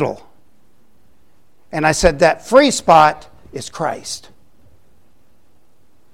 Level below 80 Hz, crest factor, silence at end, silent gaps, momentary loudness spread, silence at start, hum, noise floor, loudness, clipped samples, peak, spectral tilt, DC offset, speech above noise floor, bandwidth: -38 dBFS; 18 dB; 1.95 s; none; 20 LU; 0 s; none; -59 dBFS; -14 LUFS; under 0.1%; 0 dBFS; -4 dB/octave; 0.8%; 44 dB; 16 kHz